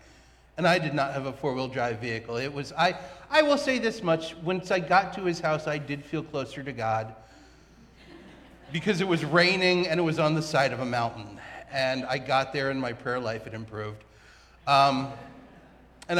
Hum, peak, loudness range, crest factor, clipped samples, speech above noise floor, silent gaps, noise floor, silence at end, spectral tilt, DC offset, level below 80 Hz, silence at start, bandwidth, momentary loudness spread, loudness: none; -8 dBFS; 6 LU; 20 dB; under 0.1%; 29 dB; none; -56 dBFS; 0 s; -5 dB/octave; under 0.1%; -58 dBFS; 0.55 s; 14.5 kHz; 15 LU; -27 LUFS